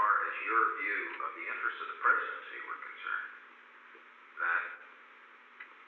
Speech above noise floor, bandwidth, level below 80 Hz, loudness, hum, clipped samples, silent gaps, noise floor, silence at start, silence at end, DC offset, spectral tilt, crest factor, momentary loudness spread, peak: 22 dB; 4.5 kHz; under -90 dBFS; -33 LUFS; none; under 0.1%; none; -57 dBFS; 0 s; 0 s; under 0.1%; 5 dB/octave; 20 dB; 25 LU; -16 dBFS